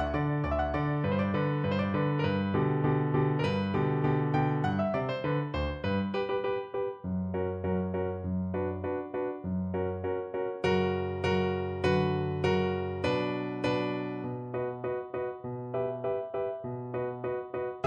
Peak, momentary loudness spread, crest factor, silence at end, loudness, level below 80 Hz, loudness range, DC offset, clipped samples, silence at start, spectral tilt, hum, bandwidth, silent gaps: -14 dBFS; 7 LU; 16 dB; 0 s; -31 LUFS; -50 dBFS; 5 LU; under 0.1%; under 0.1%; 0 s; -8.5 dB/octave; none; 8.6 kHz; none